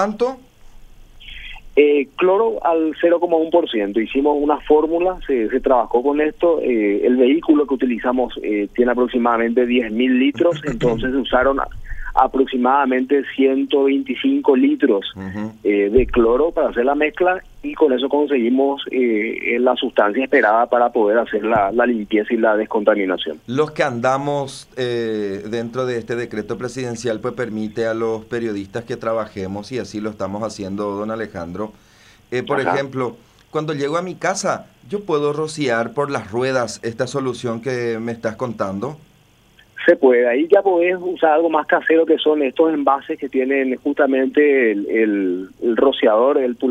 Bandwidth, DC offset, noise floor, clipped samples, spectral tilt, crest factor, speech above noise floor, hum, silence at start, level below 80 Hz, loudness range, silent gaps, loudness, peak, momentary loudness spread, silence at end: 11 kHz; under 0.1%; -53 dBFS; under 0.1%; -5.5 dB/octave; 16 dB; 35 dB; none; 0 s; -42 dBFS; 7 LU; none; -18 LUFS; 0 dBFS; 10 LU; 0 s